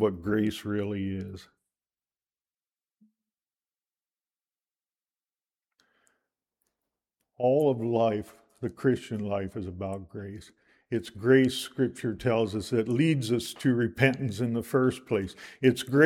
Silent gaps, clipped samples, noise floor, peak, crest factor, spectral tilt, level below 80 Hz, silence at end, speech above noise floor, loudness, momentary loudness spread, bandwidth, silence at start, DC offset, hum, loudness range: none; under 0.1%; under -90 dBFS; -6 dBFS; 24 dB; -6.5 dB/octave; -62 dBFS; 0 s; over 63 dB; -28 LUFS; 14 LU; 16.5 kHz; 0 s; under 0.1%; none; 8 LU